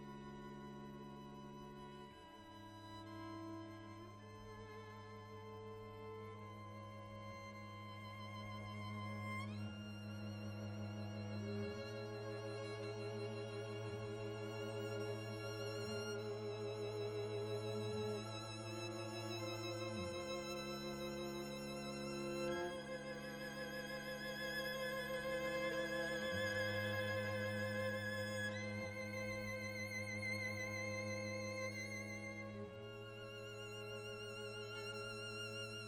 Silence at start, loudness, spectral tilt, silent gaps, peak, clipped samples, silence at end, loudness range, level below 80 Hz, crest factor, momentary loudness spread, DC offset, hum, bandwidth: 0 s; -46 LUFS; -5 dB/octave; none; -30 dBFS; under 0.1%; 0 s; 12 LU; -70 dBFS; 16 dB; 12 LU; under 0.1%; none; 16.5 kHz